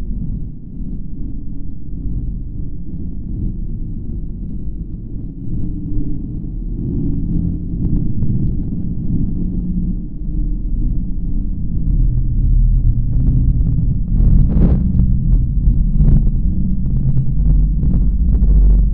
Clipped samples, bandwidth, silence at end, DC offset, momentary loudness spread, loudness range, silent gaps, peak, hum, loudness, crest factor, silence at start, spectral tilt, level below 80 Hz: under 0.1%; 1.3 kHz; 0 s; 4%; 14 LU; 11 LU; none; 0 dBFS; none; -19 LUFS; 14 dB; 0 s; -14 dB/octave; -16 dBFS